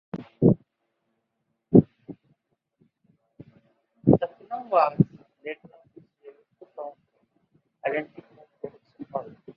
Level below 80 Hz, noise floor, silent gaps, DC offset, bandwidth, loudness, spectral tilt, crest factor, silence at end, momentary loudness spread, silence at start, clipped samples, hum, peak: -58 dBFS; -78 dBFS; none; under 0.1%; 5.2 kHz; -24 LUFS; -12 dB/octave; 26 dB; 0.05 s; 22 LU; 0.15 s; under 0.1%; none; -2 dBFS